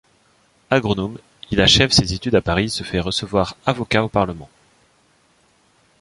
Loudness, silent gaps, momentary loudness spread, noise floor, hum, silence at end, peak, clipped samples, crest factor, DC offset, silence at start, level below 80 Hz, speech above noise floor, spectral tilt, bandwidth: -18 LUFS; none; 11 LU; -58 dBFS; none; 1.55 s; 0 dBFS; under 0.1%; 20 dB; under 0.1%; 0.7 s; -38 dBFS; 40 dB; -4 dB/octave; 11.5 kHz